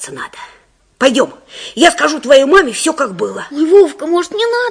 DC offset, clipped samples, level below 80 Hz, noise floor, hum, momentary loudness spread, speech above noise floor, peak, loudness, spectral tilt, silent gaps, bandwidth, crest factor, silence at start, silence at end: under 0.1%; 1%; -50 dBFS; -35 dBFS; none; 16 LU; 23 dB; 0 dBFS; -12 LUFS; -2.5 dB/octave; none; 11 kHz; 12 dB; 0 s; 0 s